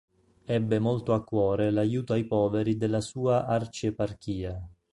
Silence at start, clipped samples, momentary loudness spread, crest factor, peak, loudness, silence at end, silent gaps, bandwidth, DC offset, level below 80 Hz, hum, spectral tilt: 0.5 s; under 0.1%; 9 LU; 16 dB; -12 dBFS; -28 LUFS; 0.25 s; none; 11.5 kHz; under 0.1%; -52 dBFS; none; -7.5 dB/octave